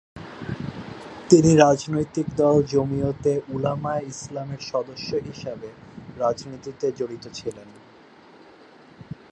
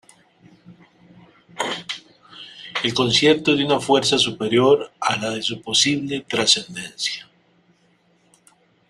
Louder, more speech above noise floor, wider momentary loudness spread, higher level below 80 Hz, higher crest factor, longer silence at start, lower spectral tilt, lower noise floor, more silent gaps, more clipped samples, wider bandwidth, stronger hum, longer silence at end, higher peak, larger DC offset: second, -23 LUFS vs -19 LUFS; second, 27 dB vs 41 dB; first, 22 LU vs 16 LU; first, -52 dBFS vs -60 dBFS; about the same, 22 dB vs 22 dB; second, 0.15 s vs 0.7 s; first, -6 dB/octave vs -3 dB/octave; second, -50 dBFS vs -60 dBFS; neither; neither; second, 9.4 kHz vs 13 kHz; neither; second, 0.2 s vs 1.65 s; about the same, -2 dBFS vs -2 dBFS; neither